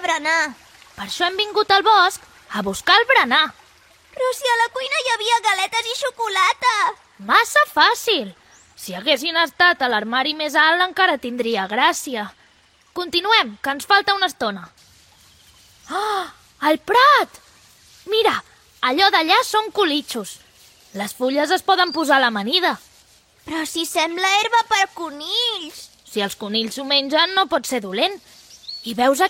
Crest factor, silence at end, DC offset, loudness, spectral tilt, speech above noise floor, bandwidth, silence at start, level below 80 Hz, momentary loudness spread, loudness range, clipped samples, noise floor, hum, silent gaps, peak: 18 dB; 0 s; under 0.1%; -18 LUFS; -1.5 dB/octave; 36 dB; 16.5 kHz; 0 s; -62 dBFS; 15 LU; 3 LU; under 0.1%; -55 dBFS; none; none; -2 dBFS